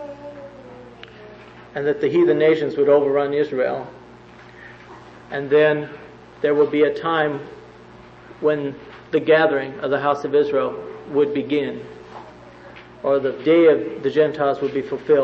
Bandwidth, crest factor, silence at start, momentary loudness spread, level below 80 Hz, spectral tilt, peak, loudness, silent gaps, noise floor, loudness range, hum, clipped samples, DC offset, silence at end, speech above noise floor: 6.4 kHz; 18 dB; 0 s; 24 LU; -58 dBFS; -7.5 dB/octave; -4 dBFS; -19 LUFS; none; -43 dBFS; 3 LU; none; under 0.1%; under 0.1%; 0 s; 25 dB